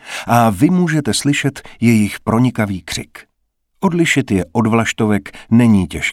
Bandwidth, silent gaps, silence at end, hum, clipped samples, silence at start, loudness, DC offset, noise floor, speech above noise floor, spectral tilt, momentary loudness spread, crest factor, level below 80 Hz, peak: 15.5 kHz; none; 0 s; none; under 0.1%; 0.05 s; -15 LUFS; under 0.1%; -67 dBFS; 52 dB; -5.5 dB/octave; 8 LU; 14 dB; -44 dBFS; 0 dBFS